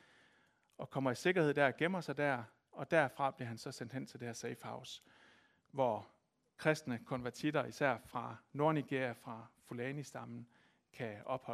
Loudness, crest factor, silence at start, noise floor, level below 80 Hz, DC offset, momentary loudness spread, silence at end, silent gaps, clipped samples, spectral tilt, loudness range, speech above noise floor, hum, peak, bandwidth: -38 LUFS; 24 dB; 0.8 s; -73 dBFS; -78 dBFS; under 0.1%; 16 LU; 0 s; none; under 0.1%; -5.5 dB/octave; 6 LU; 35 dB; none; -16 dBFS; 15 kHz